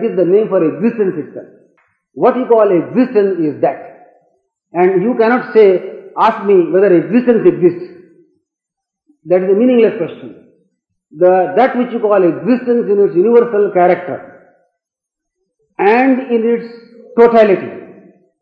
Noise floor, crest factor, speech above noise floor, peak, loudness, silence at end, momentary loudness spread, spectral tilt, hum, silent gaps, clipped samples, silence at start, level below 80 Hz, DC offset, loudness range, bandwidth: -80 dBFS; 14 dB; 69 dB; 0 dBFS; -12 LUFS; 0.5 s; 15 LU; -9.5 dB/octave; none; none; under 0.1%; 0 s; -62 dBFS; under 0.1%; 4 LU; 5.2 kHz